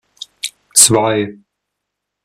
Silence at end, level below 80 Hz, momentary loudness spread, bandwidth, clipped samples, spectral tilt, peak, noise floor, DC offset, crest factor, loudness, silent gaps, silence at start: 0.9 s; -54 dBFS; 18 LU; 16 kHz; 0.2%; -2.5 dB/octave; 0 dBFS; -78 dBFS; under 0.1%; 18 dB; -11 LUFS; none; 0.45 s